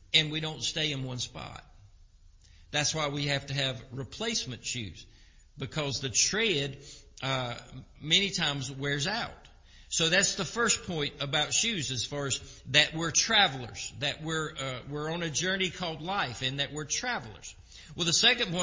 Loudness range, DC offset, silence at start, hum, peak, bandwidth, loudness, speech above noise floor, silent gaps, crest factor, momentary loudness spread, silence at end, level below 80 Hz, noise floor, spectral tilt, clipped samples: 6 LU; under 0.1%; 0.1 s; none; -6 dBFS; 7.8 kHz; -29 LUFS; 26 dB; none; 26 dB; 16 LU; 0 s; -56 dBFS; -57 dBFS; -2 dB/octave; under 0.1%